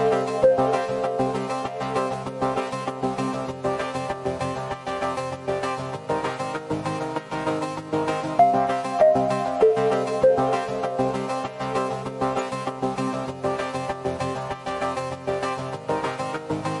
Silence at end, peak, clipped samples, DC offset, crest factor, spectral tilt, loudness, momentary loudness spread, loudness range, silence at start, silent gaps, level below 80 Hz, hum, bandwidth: 0 s; -6 dBFS; under 0.1%; under 0.1%; 18 dB; -6 dB/octave; -25 LUFS; 9 LU; 7 LU; 0 s; none; -56 dBFS; none; 11.5 kHz